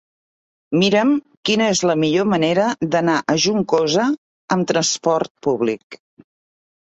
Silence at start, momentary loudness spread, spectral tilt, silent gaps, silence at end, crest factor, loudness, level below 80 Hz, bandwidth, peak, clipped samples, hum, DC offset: 0.7 s; 6 LU; -4 dB/octave; 1.37-1.43 s, 4.18-4.48 s, 5.30-5.35 s, 5.83-5.90 s; 1 s; 16 dB; -18 LUFS; -60 dBFS; 8.2 kHz; -2 dBFS; under 0.1%; none; under 0.1%